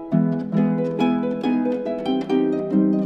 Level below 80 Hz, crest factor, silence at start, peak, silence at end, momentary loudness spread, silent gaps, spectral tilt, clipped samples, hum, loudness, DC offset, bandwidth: -60 dBFS; 14 dB; 0 s; -6 dBFS; 0 s; 4 LU; none; -9 dB/octave; under 0.1%; none; -22 LUFS; under 0.1%; 7.6 kHz